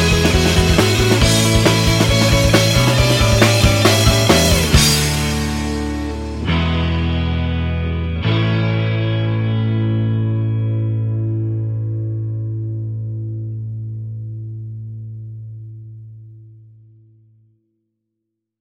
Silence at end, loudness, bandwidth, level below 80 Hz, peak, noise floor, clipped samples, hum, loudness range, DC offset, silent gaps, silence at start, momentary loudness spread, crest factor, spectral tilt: 2.1 s; -16 LUFS; 16.5 kHz; -26 dBFS; 0 dBFS; -77 dBFS; under 0.1%; none; 18 LU; under 0.1%; none; 0 s; 17 LU; 16 dB; -4.5 dB/octave